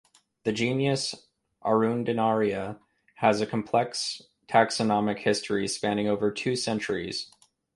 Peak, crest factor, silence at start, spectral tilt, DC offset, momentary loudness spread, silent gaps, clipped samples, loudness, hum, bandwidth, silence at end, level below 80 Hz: -6 dBFS; 20 dB; 0.45 s; -4.5 dB/octave; under 0.1%; 10 LU; none; under 0.1%; -27 LUFS; none; 11.5 kHz; 0.5 s; -64 dBFS